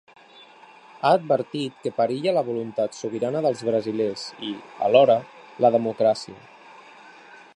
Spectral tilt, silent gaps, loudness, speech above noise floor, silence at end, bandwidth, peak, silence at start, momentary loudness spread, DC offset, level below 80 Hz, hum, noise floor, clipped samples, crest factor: -6 dB/octave; none; -23 LUFS; 27 dB; 0.2 s; 10.5 kHz; -2 dBFS; 1.05 s; 12 LU; under 0.1%; -74 dBFS; none; -49 dBFS; under 0.1%; 22 dB